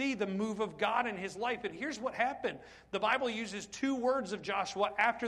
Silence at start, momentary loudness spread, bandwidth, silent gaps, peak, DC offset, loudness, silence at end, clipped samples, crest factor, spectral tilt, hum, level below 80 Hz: 0 s; 8 LU; 12 kHz; none; -16 dBFS; under 0.1%; -34 LUFS; 0 s; under 0.1%; 18 dB; -4 dB/octave; none; -68 dBFS